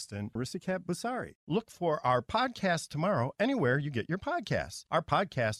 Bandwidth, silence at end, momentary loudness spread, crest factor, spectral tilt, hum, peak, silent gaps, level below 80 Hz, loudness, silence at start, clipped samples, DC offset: 14.5 kHz; 0 s; 7 LU; 18 dB; -5.5 dB/octave; none; -14 dBFS; 1.35-1.47 s; -60 dBFS; -32 LUFS; 0 s; under 0.1%; under 0.1%